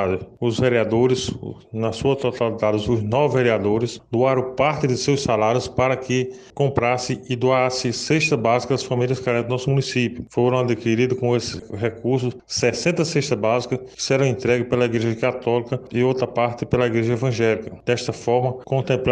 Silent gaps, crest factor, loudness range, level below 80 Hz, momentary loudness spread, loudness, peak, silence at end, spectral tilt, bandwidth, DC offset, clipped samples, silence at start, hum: none; 16 dB; 1 LU; -50 dBFS; 6 LU; -21 LUFS; -4 dBFS; 0 s; -5.5 dB/octave; 9.8 kHz; under 0.1%; under 0.1%; 0 s; none